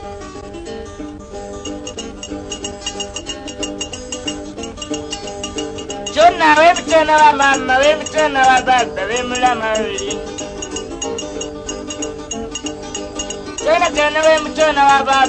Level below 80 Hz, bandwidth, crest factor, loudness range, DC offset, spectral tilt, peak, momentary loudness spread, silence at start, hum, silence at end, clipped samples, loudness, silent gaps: -40 dBFS; 9.4 kHz; 16 dB; 13 LU; under 0.1%; -2.5 dB/octave; 0 dBFS; 17 LU; 0 s; none; 0 s; under 0.1%; -16 LUFS; none